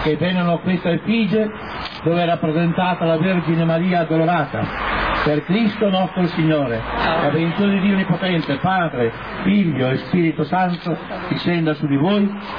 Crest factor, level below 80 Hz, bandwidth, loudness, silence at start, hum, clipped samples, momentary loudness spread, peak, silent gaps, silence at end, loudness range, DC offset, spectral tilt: 12 dB; -42 dBFS; 5.2 kHz; -19 LUFS; 0 s; none; under 0.1%; 5 LU; -6 dBFS; none; 0 s; 1 LU; 0.2%; -9 dB/octave